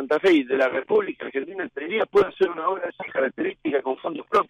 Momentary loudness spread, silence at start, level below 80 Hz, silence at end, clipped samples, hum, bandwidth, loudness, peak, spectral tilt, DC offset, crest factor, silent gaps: 11 LU; 0 s; -64 dBFS; 0.05 s; under 0.1%; none; 8.8 kHz; -24 LUFS; -10 dBFS; -5.5 dB/octave; under 0.1%; 14 dB; none